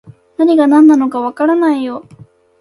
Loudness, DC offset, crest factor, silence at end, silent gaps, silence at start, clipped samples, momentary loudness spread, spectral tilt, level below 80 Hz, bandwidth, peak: -11 LUFS; under 0.1%; 12 dB; 0.6 s; none; 0.4 s; under 0.1%; 16 LU; -6 dB/octave; -60 dBFS; 11.5 kHz; 0 dBFS